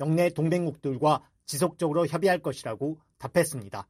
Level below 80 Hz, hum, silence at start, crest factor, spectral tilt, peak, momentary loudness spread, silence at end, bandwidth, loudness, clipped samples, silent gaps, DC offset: -64 dBFS; none; 0 s; 16 dB; -6 dB/octave; -10 dBFS; 9 LU; 0.05 s; 15 kHz; -27 LUFS; under 0.1%; none; under 0.1%